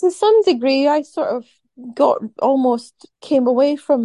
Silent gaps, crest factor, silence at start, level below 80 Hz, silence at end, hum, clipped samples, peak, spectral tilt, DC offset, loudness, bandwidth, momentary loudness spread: none; 14 dB; 0 s; -70 dBFS; 0 s; none; under 0.1%; -2 dBFS; -4.5 dB/octave; under 0.1%; -17 LUFS; 11.5 kHz; 9 LU